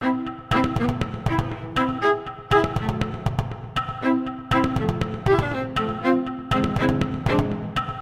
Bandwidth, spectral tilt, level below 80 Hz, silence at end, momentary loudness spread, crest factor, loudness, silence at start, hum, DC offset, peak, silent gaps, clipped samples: 14.5 kHz; -7 dB/octave; -38 dBFS; 0 s; 6 LU; 18 dB; -24 LUFS; 0 s; none; under 0.1%; -4 dBFS; none; under 0.1%